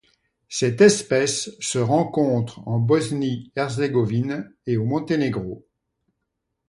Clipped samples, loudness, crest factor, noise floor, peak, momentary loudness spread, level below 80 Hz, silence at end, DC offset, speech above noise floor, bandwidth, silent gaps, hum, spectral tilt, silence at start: under 0.1%; -22 LUFS; 20 dB; -78 dBFS; -4 dBFS; 12 LU; -58 dBFS; 1.1 s; under 0.1%; 57 dB; 11.5 kHz; none; none; -5.5 dB/octave; 0.5 s